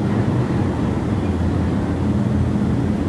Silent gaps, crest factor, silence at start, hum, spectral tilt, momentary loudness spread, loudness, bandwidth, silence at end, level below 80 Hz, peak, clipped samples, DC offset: none; 12 dB; 0 s; none; -8.5 dB/octave; 2 LU; -20 LUFS; 11 kHz; 0 s; -32 dBFS; -6 dBFS; under 0.1%; under 0.1%